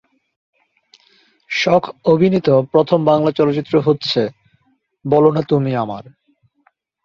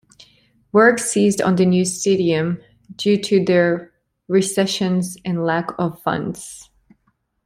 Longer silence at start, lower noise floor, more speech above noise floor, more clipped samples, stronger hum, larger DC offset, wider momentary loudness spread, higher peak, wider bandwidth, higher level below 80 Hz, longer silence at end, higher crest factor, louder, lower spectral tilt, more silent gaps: first, 1.5 s vs 0.75 s; second, -61 dBFS vs -67 dBFS; about the same, 46 dB vs 49 dB; neither; neither; neither; about the same, 9 LU vs 11 LU; about the same, -2 dBFS vs -2 dBFS; second, 7.2 kHz vs 15.5 kHz; about the same, -58 dBFS vs -58 dBFS; first, 1.05 s vs 0.85 s; about the same, 16 dB vs 18 dB; about the same, -16 LUFS vs -18 LUFS; first, -7 dB/octave vs -5 dB/octave; neither